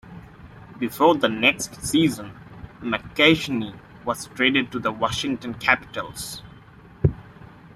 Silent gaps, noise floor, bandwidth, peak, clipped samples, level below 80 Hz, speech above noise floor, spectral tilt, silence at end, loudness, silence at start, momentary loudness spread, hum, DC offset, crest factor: none; -47 dBFS; 16 kHz; -2 dBFS; under 0.1%; -48 dBFS; 24 dB; -4.5 dB/octave; 0.1 s; -22 LUFS; 0.05 s; 17 LU; none; under 0.1%; 22 dB